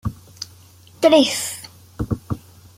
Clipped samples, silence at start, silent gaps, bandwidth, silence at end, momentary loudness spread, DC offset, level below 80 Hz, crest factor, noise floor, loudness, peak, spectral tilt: under 0.1%; 0.05 s; none; 16.5 kHz; 0.4 s; 21 LU; under 0.1%; -44 dBFS; 20 dB; -47 dBFS; -19 LUFS; -2 dBFS; -4.5 dB/octave